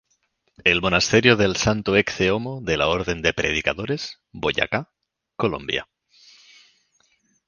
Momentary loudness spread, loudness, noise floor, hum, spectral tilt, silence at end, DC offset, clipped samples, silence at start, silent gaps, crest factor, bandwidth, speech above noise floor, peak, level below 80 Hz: 11 LU; -21 LUFS; -69 dBFS; none; -4 dB/octave; 1.65 s; under 0.1%; under 0.1%; 0.65 s; none; 22 dB; 10 kHz; 48 dB; 0 dBFS; -44 dBFS